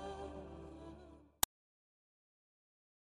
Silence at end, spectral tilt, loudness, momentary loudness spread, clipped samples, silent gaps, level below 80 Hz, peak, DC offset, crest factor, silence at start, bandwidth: 1.55 s; -2 dB/octave; -42 LUFS; 19 LU; under 0.1%; none; -62 dBFS; -10 dBFS; under 0.1%; 38 dB; 0 s; 11.5 kHz